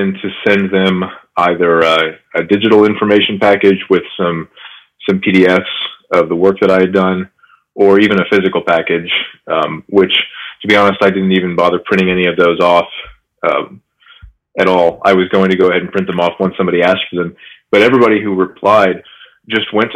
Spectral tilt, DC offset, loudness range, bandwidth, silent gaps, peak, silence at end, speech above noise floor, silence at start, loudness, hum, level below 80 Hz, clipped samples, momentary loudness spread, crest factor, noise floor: -6.5 dB/octave; under 0.1%; 2 LU; 9.6 kHz; none; 0 dBFS; 0 s; 29 dB; 0 s; -12 LUFS; none; -52 dBFS; 0.3%; 10 LU; 12 dB; -41 dBFS